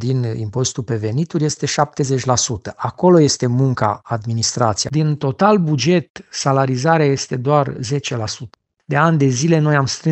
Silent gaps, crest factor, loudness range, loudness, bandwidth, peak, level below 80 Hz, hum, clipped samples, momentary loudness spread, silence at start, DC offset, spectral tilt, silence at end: 6.10-6.15 s; 16 dB; 2 LU; -17 LUFS; 8.6 kHz; 0 dBFS; -52 dBFS; none; under 0.1%; 8 LU; 0 s; under 0.1%; -5 dB/octave; 0 s